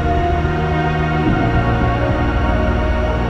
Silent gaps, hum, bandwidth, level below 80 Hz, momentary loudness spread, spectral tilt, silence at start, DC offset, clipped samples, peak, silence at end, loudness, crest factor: none; none; 7.8 kHz; -22 dBFS; 2 LU; -8 dB/octave; 0 s; under 0.1%; under 0.1%; -4 dBFS; 0 s; -17 LUFS; 12 dB